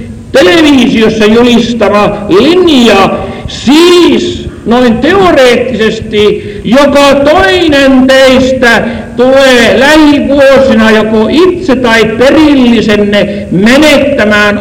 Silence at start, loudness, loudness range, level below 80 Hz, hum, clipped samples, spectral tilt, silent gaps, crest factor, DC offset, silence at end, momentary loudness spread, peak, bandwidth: 0 s; -4 LUFS; 2 LU; -28 dBFS; none; 10%; -4.5 dB/octave; none; 4 dB; under 0.1%; 0 s; 6 LU; 0 dBFS; 16.5 kHz